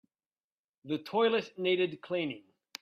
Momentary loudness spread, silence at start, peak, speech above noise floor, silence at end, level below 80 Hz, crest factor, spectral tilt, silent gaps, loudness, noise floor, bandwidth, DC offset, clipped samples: 12 LU; 0.85 s; -16 dBFS; over 59 dB; 0.4 s; -80 dBFS; 18 dB; -5.5 dB/octave; none; -32 LUFS; under -90 dBFS; 13.5 kHz; under 0.1%; under 0.1%